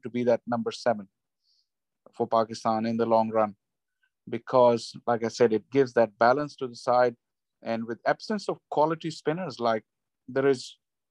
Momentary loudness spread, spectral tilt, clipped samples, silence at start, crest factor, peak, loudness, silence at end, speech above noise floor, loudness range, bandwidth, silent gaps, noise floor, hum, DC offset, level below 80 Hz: 10 LU; -6 dB/octave; under 0.1%; 0.05 s; 20 dB; -8 dBFS; -27 LUFS; 0.4 s; 51 dB; 4 LU; 10.5 kHz; none; -77 dBFS; none; under 0.1%; -76 dBFS